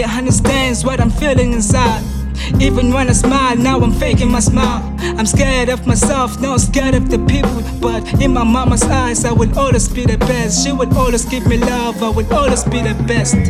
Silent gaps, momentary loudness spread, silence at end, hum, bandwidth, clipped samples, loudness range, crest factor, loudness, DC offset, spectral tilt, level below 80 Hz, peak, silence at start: none; 4 LU; 0 s; none; 15 kHz; under 0.1%; 1 LU; 12 dB; -14 LUFS; under 0.1%; -5 dB/octave; -20 dBFS; 0 dBFS; 0 s